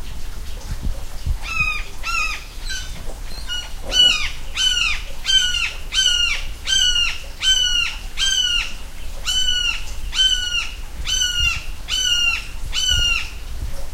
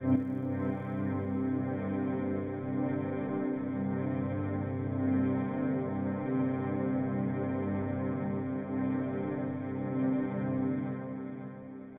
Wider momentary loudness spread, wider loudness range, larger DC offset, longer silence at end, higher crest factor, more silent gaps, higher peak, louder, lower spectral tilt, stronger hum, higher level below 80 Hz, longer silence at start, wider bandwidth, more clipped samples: first, 17 LU vs 4 LU; about the same, 4 LU vs 2 LU; neither; about the same, 0 s vs 0 s; about the same, 18 dB vs 16 dB; neither; first, -4 dBFS vs -16 dBFS; first, -18 LUFS vs -33 LUFS; second, 0 dB/octave vs -12 dB/octave; second, none vs 50 Hz at -55 dBFS; first, -28 dBFS vs -64 dBFS; about the same, 0 s vs 0 s; first, 16 kHz vs 3.6 kHz; neither